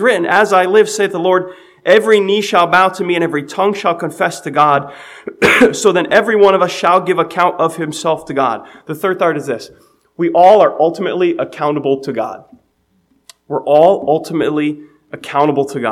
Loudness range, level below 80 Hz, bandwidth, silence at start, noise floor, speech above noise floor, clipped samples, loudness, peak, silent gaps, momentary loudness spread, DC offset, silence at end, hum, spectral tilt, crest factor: 4 LU; -56 dBFS; 15.5 kHz; 0 s; -60 dBFS; 46 dB; 0.2%; -13 LUFS; 0 dBFS; none; 12 LU; under 0.1%; 0 s; none; -4.5 dB/octave; 14 dB